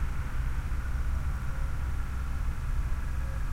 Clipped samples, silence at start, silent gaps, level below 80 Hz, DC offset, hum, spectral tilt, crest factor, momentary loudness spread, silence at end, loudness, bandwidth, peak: under 0.1%; 0 s; none; -30 dBFS; under 0.1%; none; -6.5 dB/octave; 10 dB; 2 LU; 0 s; -35 LUFS; 15.5 kHz; -20 dBFS